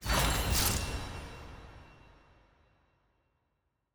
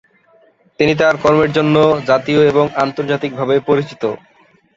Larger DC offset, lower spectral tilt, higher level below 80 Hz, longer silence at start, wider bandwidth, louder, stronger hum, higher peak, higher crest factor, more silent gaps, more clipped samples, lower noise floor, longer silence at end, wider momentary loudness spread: neither; second, -3 dB/octave vs -6.5 dB/octave; first, -42 dBFS vs -50 dBFS; second, 0 s vs 0.8 s; first, over 20 kHz vs 7.6 kHz; second, -31 LUFS vs -14 LUFS; neither; second, -16 dBFS vs 0 dBFS; first, 20 dB vs 14 dB; neither; neither; first, -80 dBFS vs -52 dBFS; first, 2 s vs 0.6 s; first, 22 LU vs 8 LU